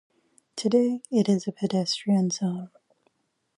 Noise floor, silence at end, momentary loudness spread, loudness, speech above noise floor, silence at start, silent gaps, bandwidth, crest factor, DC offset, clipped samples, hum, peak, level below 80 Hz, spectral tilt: -71 dBFS; 0.9 s; 11 LU; -25 LUFS; 46 dB; 0.55 s; none; 11 kHz; 18 dB; under 0.1%; under 0.1%; none; -10 dBFS; -76 dBFS; -6 dB/octave